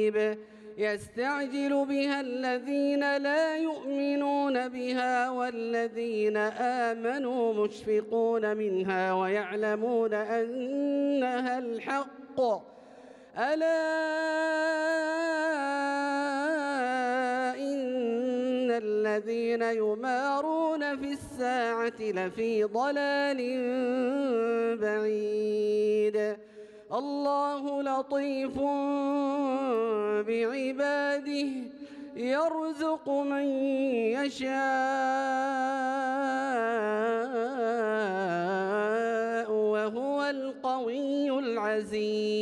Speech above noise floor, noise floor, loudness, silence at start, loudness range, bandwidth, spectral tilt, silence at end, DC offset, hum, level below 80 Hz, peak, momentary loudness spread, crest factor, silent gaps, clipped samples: 22 dB; -51 dBFS; -29 LUFS; 0 s; 2 LU; 11.5 kHz; -5 dB/octave; 0 s; under 0.1%; none; -72 dBFS; -16 dBFS; 4 LU; 12 dB; none; under 0.1%